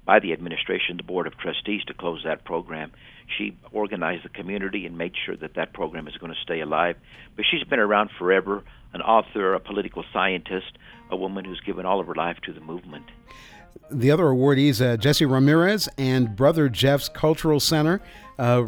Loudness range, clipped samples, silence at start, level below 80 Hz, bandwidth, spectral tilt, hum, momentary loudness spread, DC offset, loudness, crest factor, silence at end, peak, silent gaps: 10 LU; under 0.1%; 0.05 s; -50 dBFS; over 20 kHz; -5.5 dB/octave; none; 15 LU; under 0.1%; -23 LUFS; 22 dB; 0 s; -2 dBFS; none